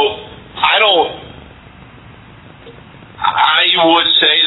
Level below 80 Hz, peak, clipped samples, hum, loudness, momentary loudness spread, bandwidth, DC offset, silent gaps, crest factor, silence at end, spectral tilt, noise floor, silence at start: -48 dBFS; 0 dBFS; under 0.1%; none; -11 LUFS; 18 LU; 4.1 kHz; under 0.1%; none; 16 dB; 0 s; -5.5 dB/octave; -39 dBFS; 0 s